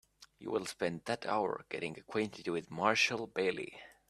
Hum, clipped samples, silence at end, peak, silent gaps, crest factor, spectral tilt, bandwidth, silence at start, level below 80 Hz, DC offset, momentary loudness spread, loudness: none; under 0.1%; 0.2 s; -12 dBFS; none; 24 dB; -4 dB/octave; 14 kHz; 0.2 s; -74 dBFS; under 0.1%; 11 LU; -35 LUFS